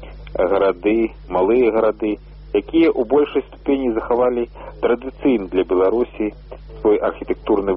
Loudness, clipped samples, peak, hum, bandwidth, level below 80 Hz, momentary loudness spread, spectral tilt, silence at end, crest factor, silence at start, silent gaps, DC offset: -19 LUFS; under 0.1%; -4 dBFS; none; 5.4 kHz; -40 dBFS; 9 LU; -5 dB/octave; 0 s; 14 dB; 0 s; none; under 0.1%